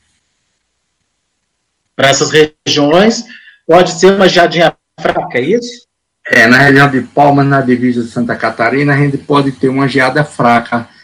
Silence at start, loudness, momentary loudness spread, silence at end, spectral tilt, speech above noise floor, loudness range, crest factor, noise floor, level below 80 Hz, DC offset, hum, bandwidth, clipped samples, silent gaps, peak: 2 s; -10 LUFS; 9 LU; 0.2 s; -5 dB/octave; 57 dB; 3 LU; 10 dB; -67 dBFS; -48 dBFS; under 0.1%; none; 15.5 kHz; 2%; none; 0 dBFS